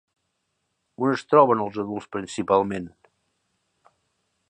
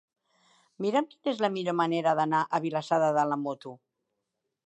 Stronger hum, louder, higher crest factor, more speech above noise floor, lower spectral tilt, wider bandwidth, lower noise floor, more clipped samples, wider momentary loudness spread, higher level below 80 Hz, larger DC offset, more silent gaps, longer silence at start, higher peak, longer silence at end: neither; first, -23 LUFS vs -28 LUFS; about the same, 22 dB vs 18 dB; about the same, 54 dB vs 56 dB; about the same, -6.5 dB/octave vs -6 dB/octave; first, 9.6 kHz vs 8.6 kHz; second, -76 dBFS vs -83 dBFS; neither; first, 14 LU vs 8 LU; first, -62 dBFS vs -84 dBFS; neither; neither; first, 1 s vs 0.8 s; first, -2 dBFS vs -12 dBFS; first, 1.6 s vs 0.9 s